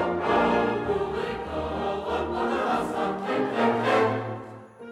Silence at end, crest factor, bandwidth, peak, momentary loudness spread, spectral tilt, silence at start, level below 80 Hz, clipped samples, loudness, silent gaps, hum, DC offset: 0 s; 16 dB; 13 kHz; -10 dBFS; 9 LU; -6 dB/octave; 0 s; -48 dBFS; under 0.1%; -26 LUFS; none; none; under 0.1%